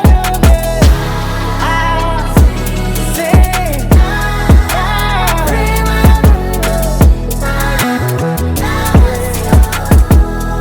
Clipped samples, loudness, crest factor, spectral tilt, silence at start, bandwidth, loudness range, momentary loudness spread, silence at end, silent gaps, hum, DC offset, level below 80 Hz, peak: under 0.1%; -12 LUFS; 10 dB; -5.5 dB/octave; 0 s; over 20 kHz; 1 LU; 6 LU; 0 s; none; none; under 0.1%; -12 dBFS; 0 dBFS